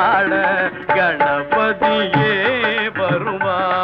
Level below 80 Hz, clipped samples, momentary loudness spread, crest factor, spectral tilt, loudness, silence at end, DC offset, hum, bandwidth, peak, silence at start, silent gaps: -52 dBFS; under 0.1%; 4 LU; 12 dB; -7.5 dB/octave; -17 LUFS; 0 s; under 0.1%; none; 6 kHz; -4 dBFS; 0 s; none